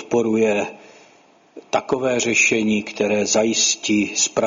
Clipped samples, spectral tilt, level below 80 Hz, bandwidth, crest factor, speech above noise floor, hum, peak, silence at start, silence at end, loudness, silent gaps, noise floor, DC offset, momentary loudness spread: under 0.1%; -2.5 dB/octave; -60 dBFS; 7.6 kHz; 16 dB; 33 dB; none; -4 dBFS; 0 s; 0 s; -18 LUFS; none; -53 dBFS; under 0.1%; 8 LU